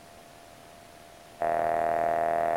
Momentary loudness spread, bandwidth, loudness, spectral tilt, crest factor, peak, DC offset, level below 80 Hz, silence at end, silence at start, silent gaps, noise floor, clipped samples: 23 LU; 16.5 kHz; -28 LUFS; -5 dB/octave; 16 dB; -14 dBFS; under 0.1%; -60 dBFS; 0 s; 0 s; none; -50 dBFS; under 0.1%